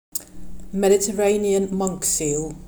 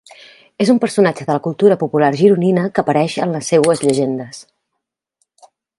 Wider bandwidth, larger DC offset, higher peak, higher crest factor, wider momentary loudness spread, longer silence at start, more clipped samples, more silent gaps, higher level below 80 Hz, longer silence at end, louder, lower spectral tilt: first, over 20 kHz vs 11.5 kHz; neither; second, -6 dBFS vs 0 dBFS; about the same, 14 dB vs 16 dB; first, 12 LU vs 7 LU; second, 0.15 s vs 0.6 s; neither; neither; first, -44 dBFS vs -60 dBFS; second, 0 s vs 1.35 s; second, -21 LUFS vs -15 LUFS; second, -4 dB/octave vs -6 dB/octave